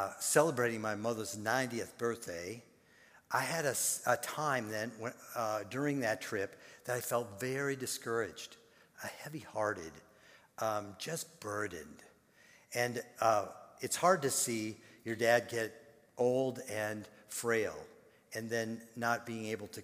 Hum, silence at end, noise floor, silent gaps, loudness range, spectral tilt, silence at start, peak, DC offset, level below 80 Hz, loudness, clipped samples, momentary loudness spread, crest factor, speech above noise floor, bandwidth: none; 0 s; -64 dBFS; none; 7 LU; -3.5 dB/octave; 0 s; -12 dBFS; under 0.1%; -76 dBFS; -36 LUFS; under 0.1%; 15 LU; 24 dB; 28 dB; 16 kHz